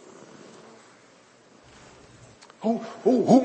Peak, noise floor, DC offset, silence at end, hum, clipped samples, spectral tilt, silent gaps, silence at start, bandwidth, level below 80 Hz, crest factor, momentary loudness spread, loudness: -6 dBFS; -55 dBFS; under 0.1%; 0 s; none; under 0.1%; -7 dB/octave; none; 2.6 s; 8.6 kHz; -70 dBFS; 22 dB; 28 LU; -24 LUFS